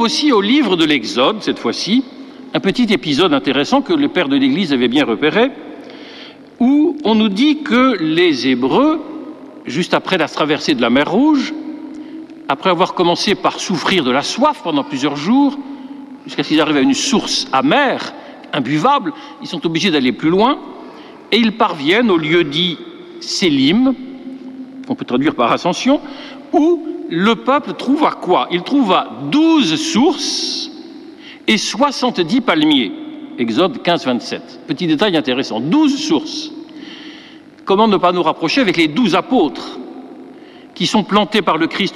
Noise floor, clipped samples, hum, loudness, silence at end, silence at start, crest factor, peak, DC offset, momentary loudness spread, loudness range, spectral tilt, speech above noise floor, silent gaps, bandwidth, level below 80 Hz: -39 dBFS; under 0.1%; none; -15 LUFS; 0 s; 0 s; 14 dB; -2 dBFS; under 0.1%; 18 LU; 2 LU; -4.5 dB/octave; 24 dB; none; 12 kHz; -54 dBFS